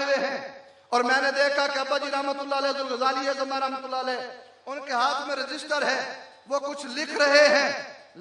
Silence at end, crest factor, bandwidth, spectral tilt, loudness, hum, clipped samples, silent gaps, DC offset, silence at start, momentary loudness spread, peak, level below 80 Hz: 0 s; 20 dB; 10.5 kHz; -1 dB/octave; -25 LUFS; none; under 0.1%; none; under 0.1%; 0 s; 15 LU; -6 dBFS; -82 dBFS